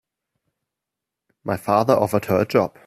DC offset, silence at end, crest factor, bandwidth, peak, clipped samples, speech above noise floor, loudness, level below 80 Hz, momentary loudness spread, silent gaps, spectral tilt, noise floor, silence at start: under 0.1%; 0.2 s; 20 dB; 15.5 kHz; -2 dBFS; under 0.1%; 66 dB; -20 LUFS; -60 dBFS; 10 LU; none; -6.5 dB/octave; -85 dBFS; 1.45 s